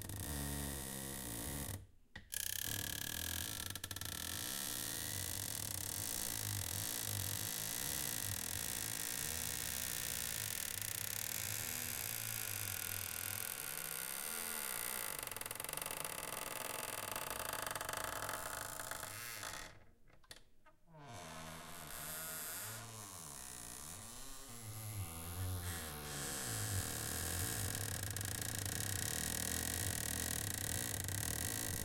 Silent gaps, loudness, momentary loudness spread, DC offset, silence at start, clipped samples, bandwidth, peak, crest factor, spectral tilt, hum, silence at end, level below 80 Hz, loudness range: none; -41 LUFS; 10 LU; under 0.1%; 0 s; under 0.1%; 17 kHz; -20 dBFS; 24 dB; -2 dB/octave; none; 0 s; -58 dBFS; 8 LU